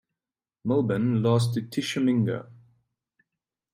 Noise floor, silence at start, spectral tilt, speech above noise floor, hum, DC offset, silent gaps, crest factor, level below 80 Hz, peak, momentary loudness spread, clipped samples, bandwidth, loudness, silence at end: under -90 dBFS; 0.65 s; -7 dB/octave; over 66 dB; none; under 0.1%; none; 16 dB; -64 dBFS; -12 dBFS; 7 LU; under 0.1%; 14.5 kHz; -26 LUFS; 1.2 s